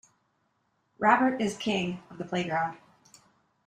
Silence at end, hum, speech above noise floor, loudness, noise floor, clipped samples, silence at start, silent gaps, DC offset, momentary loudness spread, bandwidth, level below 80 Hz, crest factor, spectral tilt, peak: 0.9 s; none; 46 dB; -28 LUFS; -74 dBFS; under 0.1%; 1 s; none; under 0.1%; 12 LU; 13 kHz; -68 dBFS; 24 dB; -5 dB/octave; -8 dBFS